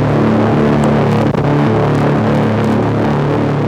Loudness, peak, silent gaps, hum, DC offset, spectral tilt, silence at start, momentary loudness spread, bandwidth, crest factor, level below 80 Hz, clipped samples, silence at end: -13 LUFS; -4 dBFS; none; none; under 0.1%; -8.5 dB/octave; 0 s; 2 LU; 10 kHz; 8 dB; -34 dBFS; under 0.1%; 0 s